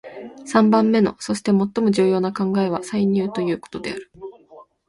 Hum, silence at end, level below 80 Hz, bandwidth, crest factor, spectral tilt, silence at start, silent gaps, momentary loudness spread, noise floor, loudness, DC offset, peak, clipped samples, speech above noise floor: none; 0.25 s; -58 dBFS; 11.5 kHz; 18 dB; -6.5 dB/octave; 0.05 s; none; 20 LU; -48 dBFS; -20 LUFS; under 0.1%; -4 dBFS; under 0.1%; 28 dB